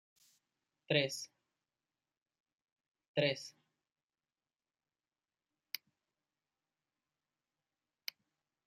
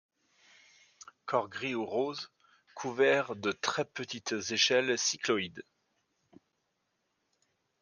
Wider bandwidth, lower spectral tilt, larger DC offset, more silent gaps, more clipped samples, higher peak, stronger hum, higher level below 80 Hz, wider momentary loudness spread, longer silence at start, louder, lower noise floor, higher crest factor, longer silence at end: first, 14.5 kHz vs 10.5 kHz; first, -4 dB/octave vs -2.5 dB/octave; neither; first, 2.22-2.26 s, 2.40-2.44 s, 2.64-2.76 s, 3.08-3.14 s vs none; neither; second, -18 dBFS vs -12 dBFS; neither; second, -90 dBFS vs -80 dBFS; about the same, 15 LU vs 15 LU; second, 0.9 s vs 1.25 s; second, -38 LUFS vs -31 LUFS; first, under -90 dBFS vs -80 dBFS; first, 28 dB vs 22 dB; first, 5.15 s vs 2.2 s